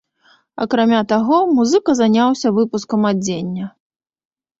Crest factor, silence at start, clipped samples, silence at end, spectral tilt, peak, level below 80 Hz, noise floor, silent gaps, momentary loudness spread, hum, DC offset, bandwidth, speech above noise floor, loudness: 14 dB; 0.6 s; under 0.1%; 0.9 s; -5.5 dB/octave; -2 dBFS; -58 dBFS; -55 dBFS; none; 12 LU; none; under 0.1%; 7.8 kHz; 40 dB; -16 LUFS